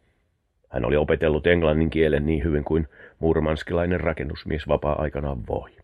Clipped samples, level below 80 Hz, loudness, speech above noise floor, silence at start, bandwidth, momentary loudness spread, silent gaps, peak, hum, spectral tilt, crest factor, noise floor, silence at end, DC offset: under 0.1%; -34 dBFS; -24 LUFS; 46 dB; 0.7 s; 7.4 kHz; 10 LU; none; -4 dBFS; none; -8.5 dB/octave; 20 dB; -69 dBFS; 0.15 s; under 0.1%